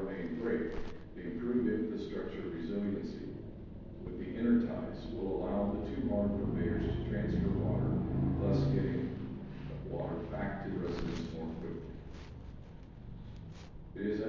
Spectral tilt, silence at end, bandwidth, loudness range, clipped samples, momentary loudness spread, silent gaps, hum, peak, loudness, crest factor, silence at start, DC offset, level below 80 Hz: -9 dB/octave; 0 s; 7 kHz; 8 LU; under 0.1%; 17 LU; none; none; -18 dBFS; -36 LUFS; 16 dB; 0 s; under 0.1%; -48 dBFS